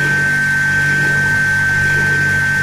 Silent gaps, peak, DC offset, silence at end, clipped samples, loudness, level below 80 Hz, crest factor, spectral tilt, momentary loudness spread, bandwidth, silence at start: none; -4 dBFS; under 0.1%; 0 s; under 0.1%; -13 LUFS; -40 dBFS; 10 dB; -4 dB/octave; 1 LU; 16 kHz; 0 s